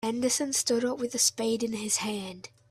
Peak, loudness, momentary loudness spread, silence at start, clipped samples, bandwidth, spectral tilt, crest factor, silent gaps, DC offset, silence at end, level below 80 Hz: -10 dBFS; -27 LUFS; 11 LU; 0 s; under 0.1%; 15.5 kHz; -2 dB/octave; 18 dB; none; under 0.1%; 0.25 s; -70 dBFS